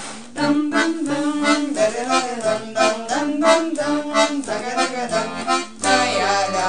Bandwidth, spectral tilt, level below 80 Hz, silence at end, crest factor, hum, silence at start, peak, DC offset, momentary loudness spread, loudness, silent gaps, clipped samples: 10.5 kHz; -3 dB/octave; -60 dBFS; 0 s; 18 dB; none; 0 s; -2 dBFS; 0.9%; 6 LU; -20 LUFS; none; under 0.1%